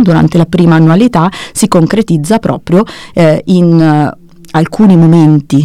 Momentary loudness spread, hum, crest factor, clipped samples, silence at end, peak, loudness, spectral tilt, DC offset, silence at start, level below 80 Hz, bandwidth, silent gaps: 8 LU; none; 8 dB; 8%; 0 s; 0 dBFS; -8 LUFS; -7 dB/octave; 1%; 0 s; -38 dBFS; 13 kHz; none